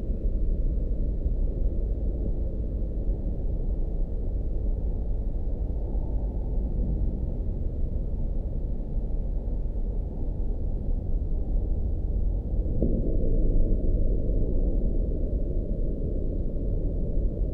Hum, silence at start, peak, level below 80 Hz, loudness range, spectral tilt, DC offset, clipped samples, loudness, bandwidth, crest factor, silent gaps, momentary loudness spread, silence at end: none; 0 s; -10 dBFS; -26 dBFS; 4 LU; -12.5 dB/octave; under 0.1%; under 0.1%; -31 LUFS; 1 kHz; 14 dB; none; 5 LU; 0 s